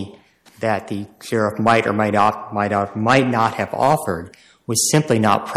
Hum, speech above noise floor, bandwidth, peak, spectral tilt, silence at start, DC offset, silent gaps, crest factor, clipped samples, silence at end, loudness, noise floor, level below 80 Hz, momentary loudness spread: none; 29 dB; 15.5 kHz; -4 dBFS; -4.5 dB/octave; 0 s; under 0.1%; none; 14 dB; under 0.1%; 0 s; -18 LUFS; -48 dBFS; -56 dBFS; 11 LU